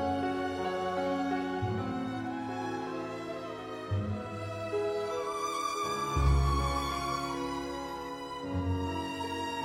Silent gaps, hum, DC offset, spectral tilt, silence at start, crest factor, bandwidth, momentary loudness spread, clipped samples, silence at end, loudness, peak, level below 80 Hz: none; none; under 0.1%; -6 dB/octave; 0 s; 18 dB; 16 kHz; 9 LU; under 0.1%; 0 s; -34 LUFS; -14 dBFS; -40 dBFS